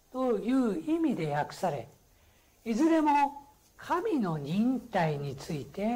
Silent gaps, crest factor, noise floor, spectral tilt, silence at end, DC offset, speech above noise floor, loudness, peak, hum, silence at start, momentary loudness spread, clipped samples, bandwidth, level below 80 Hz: none; 14 dB; -63 dBFS; -7 dB/octave; 0 s; under 0.1%; 34 dB; -30 LUFS; -18 dBFS; none; 0.15 s; 12 LU; under 0.1%; 16 kHz; -62 dBFS